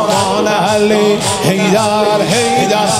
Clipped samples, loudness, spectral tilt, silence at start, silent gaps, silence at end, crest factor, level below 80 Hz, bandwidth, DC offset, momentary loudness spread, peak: under 0.1%; -12 LUFS; -4 dB/octave; 0 s; none; 0 s; 12 dB; -48 dBFS; 16 kHz; under 0.1%; 2 LU; 0 dBFS